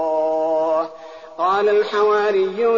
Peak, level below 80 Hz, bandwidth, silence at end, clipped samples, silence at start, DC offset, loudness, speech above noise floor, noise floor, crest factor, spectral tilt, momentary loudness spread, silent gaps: -6 dBFS; -64 dBFS; 7.2 kHz; 0 s; under 0.1%; 0 s; 0.2%; -18 LUFS; 21 dB; -38 dBFS; 12 dB; -2 dB/octave; 11 LU; none